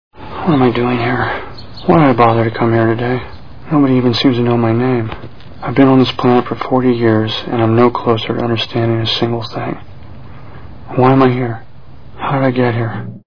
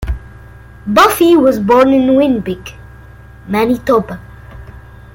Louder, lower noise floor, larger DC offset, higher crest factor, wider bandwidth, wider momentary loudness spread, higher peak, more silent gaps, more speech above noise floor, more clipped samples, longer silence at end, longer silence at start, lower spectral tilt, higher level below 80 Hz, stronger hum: second, -14 LUFS vs -11 LUFS; about the same, -38 dBFS vs -36 dBFS; first, 3% vs under 0.1%; about the same, 14 dB vs 14 dB; second, 5.4 kHz vs 17 kHz; second, 13 LU vs 18 LU; about the same, 0 dBFS vs 0 dBFS; neither; about the same, 25 dB vs 25 dB; first, 0.2% vs under 0.1%; second, 0 s vs 0.35 s; about the same, 0.1 s vs 0 s; first, -8 dB/octave vs -5.5 dB/octave; second, -42 dBFS vs -32 dBFS; neither